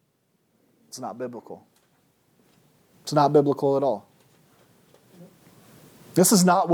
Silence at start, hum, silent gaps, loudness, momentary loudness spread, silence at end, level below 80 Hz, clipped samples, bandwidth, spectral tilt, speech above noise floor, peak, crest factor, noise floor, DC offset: 0.95 s; none; none; -22 LUFS; 24 LU; 0 s; -78 dBFS; under 0.1%; 19 kHz; -5 dB/octave; 48 dB; -6 dBFS; 20 dB; -69 dBFS; under 0.1%